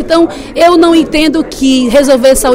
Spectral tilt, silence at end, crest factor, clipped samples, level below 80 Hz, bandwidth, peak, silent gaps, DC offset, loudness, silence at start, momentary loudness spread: -3.5 dB/octave; 0 s; 8 dB; 2%; -30 dBFS; 16.5 kHz; 0 dBFS; none; under 0.1%; -8 LUFS; 0 s; 5 LU